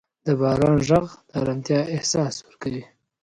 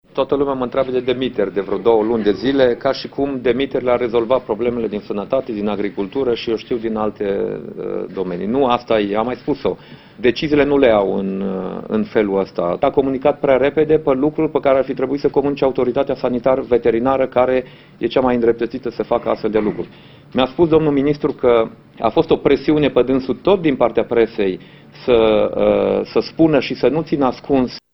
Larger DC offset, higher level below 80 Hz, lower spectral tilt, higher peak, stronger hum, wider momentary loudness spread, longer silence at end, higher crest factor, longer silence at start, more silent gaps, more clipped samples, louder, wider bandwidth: neither; about the same, -48 dBFS vs -44 dBFS; second, -5.5 dB/octave vs -8 dB/octave; second, -4 dBFS vs 0 dBFS; neither; first, 12 LU vs 7 LU; first, 0.4 s vs 0.15 s; about the same, 18 dB vs 16 dB; about the same, 0.25 s vs 0.15 s; neither; neither; second, -23 LUFS vs -17 LUFS; first, 11 kHz vs 6 kHz